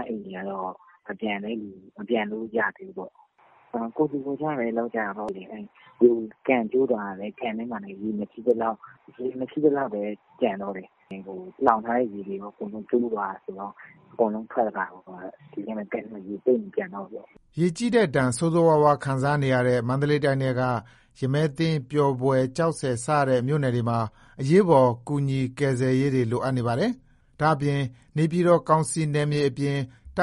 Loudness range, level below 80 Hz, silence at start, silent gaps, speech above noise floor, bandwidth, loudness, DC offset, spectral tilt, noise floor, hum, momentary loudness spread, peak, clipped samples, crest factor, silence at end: 7 LU; -60 dBFS; 0 s; none; 30 dB; 11.5 kHz; -25 LUFS; under 0.1%; -7 dB/octave; -55 dBFS; none; 16 LU; -2 dBFS; under 0.1%; 22 dB; 0 s